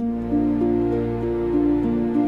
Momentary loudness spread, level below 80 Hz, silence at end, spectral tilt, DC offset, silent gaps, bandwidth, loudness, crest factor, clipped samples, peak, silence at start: 3 LU; -38 dBFS; 0 s; -10 dB/octave; under 0.1%; none; 4.5 kHz; -22 LUFS; 10 dB; under 0.1%; -10 dBFS; 0 s